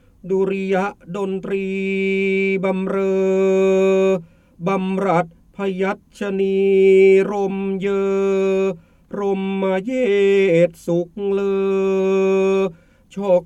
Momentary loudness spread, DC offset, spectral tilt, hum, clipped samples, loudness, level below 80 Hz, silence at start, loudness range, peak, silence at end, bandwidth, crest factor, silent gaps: 11 LU; under 0.1%; -7 dB/octave; none; under 0.1%; -19 LUFS; -56 dBFS; 0.25 s; 3 LU; -4 dBFS; 0 s; 8.4 kHz; 14 dB; none